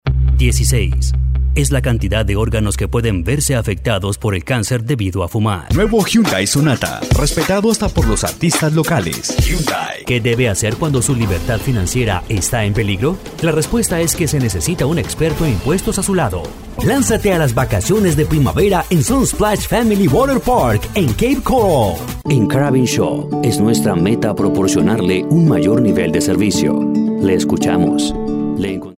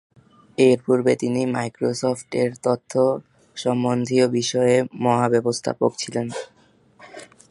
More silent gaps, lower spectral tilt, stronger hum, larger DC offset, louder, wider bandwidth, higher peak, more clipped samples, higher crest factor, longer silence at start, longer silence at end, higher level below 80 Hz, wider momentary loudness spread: neither; about the same, -5.5 dB/octave vs -5.5 dB/octave; neither; neither; first, -15 LUFS vs -21 LUFS; first, 16.5 kHz vs 11.5 kHz; about the same, -2 dBFS vs -4 dBFS; neither; second, 12 dB vs 18 dB; second, 0.05 s vs 0.6 s; second, 0.05 s vs 0.25 s; first, -24 dBFS vs -64 dBFS; second, 5 LU vs 14 LU